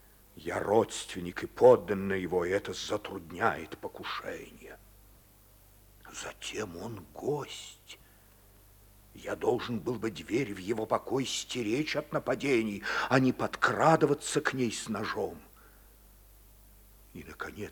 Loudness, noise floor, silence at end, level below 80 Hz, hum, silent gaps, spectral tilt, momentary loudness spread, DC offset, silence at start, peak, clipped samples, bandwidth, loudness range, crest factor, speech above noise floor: -31 LUFS; -59 dBFS; 0 s; -60 dBFS; 50 Hz at -60 dBFS; none; -4.5 dB/octave; 18 LU; under 0.1%; 0.35 s; -8 dBFS; under 0.1%; over 20 kHz; 12 LU; 24 dB; 28 dB